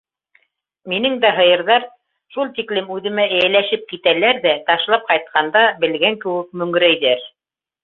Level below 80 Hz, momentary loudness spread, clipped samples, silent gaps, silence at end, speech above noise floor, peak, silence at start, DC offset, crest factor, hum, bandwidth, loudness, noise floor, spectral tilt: -66 dBFS; 9 LU; under 0.1%; none; 0.55 s; 71 dB; -2 dBFS; 0.85 s; under 0.1%; 16 dB; none; 4.8 kHz; -16 LUFS; -88 dBFS; -6.5 dB/octave